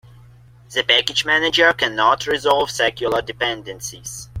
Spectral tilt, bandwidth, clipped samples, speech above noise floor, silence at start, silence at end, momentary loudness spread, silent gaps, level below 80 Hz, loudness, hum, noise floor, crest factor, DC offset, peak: -2 dB/octave; 16.5 kHz; under 0.1%; 27 dB; 0.7 s; 0 s; 15 LU; none; -48 dBFS; -17 LUFS; none; -46 dBFS; 18 dB; under 0.1%; -2 dBFS